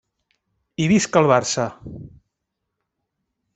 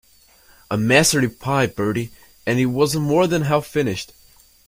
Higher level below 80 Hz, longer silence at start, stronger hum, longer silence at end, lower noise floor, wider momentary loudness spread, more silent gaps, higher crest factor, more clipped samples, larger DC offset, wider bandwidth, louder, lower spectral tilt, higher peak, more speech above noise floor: second, -56 dBFS vs -50 dBFS; about the same, 0.8 s vs 0.7 s; neither; first, 1.45 s vs 0.65 s; first, -79 dBFS vs -52 dBFS; first, 22 LU vs 13 LU; neither; about the same, 22 dB vs 20 dB; neither; neither; second, 8.4 kHz vs 16.5 kHz; about the same, -19 LUFS vs -19 LUFS; about the same, -5 dB/octave vs -4.5 dB/octave; about the same, -2 dBFS vs 0 dBFS; first, 61 dB vs 34 dB